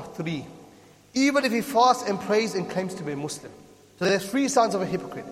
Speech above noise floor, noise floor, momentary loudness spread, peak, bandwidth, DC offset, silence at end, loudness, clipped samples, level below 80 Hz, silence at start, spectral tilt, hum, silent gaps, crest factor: 27 dB; -52 dBFS; 12 LU; -8 dBFS; 16 kHz; under 0.1%; 0 s; -25 LUFS; under 0.1%; -66 dBFS; 0 s; -4.5 dB/octave; none; none; 18 dB